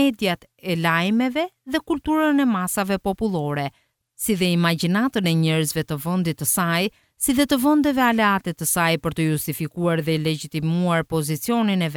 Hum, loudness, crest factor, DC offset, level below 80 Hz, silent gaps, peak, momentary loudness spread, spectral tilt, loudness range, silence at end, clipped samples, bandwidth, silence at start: none; -21 LUFS; 16 dB; under 0.1%; -52 dBFS; none; -4 dBFS; 7 LU; -5 dB/octave; 2 LU; 0 s; under 0.1%; 20 kHz; 0 s